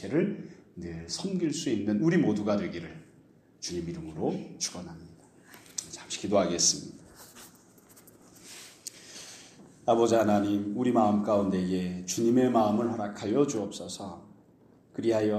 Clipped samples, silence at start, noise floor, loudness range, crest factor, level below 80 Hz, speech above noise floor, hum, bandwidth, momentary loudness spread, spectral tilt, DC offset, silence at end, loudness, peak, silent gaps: under 0.1%; 0 s; -59 dBFS; 9 LU; 20 dB; -64 dBFS; 31 dB; none; 15 kHz; 21 LU; -4.5 dB/octave; under 0.1%; 0 s; -28 LUFS; -10 dBFS; none